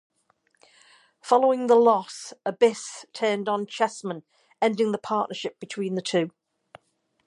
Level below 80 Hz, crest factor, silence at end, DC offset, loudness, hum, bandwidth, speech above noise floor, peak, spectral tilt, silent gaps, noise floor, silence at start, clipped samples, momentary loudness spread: -80 dBFS; 20 dB; 0.95 s; under 0.1%; -24 LUFS; none; 11.5 kHz; 45 dB; -6 dBFS; -4.5 dB/octave; none; -69 dBFS; 1.25 s; under 0.1%; 16 LU